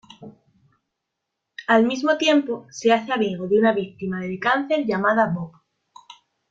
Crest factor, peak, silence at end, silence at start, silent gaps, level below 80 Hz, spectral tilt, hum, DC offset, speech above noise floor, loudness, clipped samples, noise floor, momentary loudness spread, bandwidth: 18 dB; -4 dBFS; 1 s; 0.2 s; none; -66 dBFS; -5.5 dB/octave; none; under 0.1%; 60 dB; -21 LUFS; under 0.1%; -81 dBFS; 12 LU; 7.8 kHz